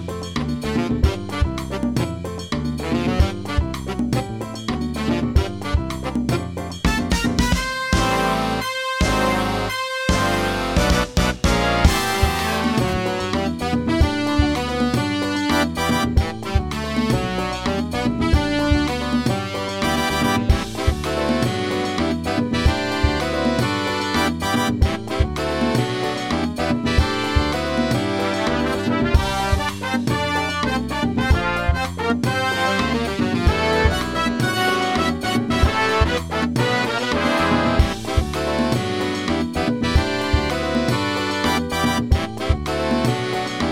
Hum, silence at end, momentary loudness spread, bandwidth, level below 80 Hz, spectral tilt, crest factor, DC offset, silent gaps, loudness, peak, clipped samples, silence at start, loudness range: none; 0 s; 5 LU; 16.5 kHz; -28 dBFS; -5 dB/octave; 20 dB; 0.2%; none; -21 LUFS; 0 dBFS; under 0.1%; 0 s; 3 LU